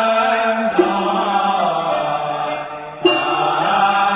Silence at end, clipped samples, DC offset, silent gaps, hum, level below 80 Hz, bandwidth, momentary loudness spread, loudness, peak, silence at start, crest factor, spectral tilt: 0 s; under 0.1%; under 0.1%; none; none; -56 dBFS; 4 kHz; 7 LU; -17 LUFS; -2 dBFS; 0 s; 16 dB; -8.5 dB/octave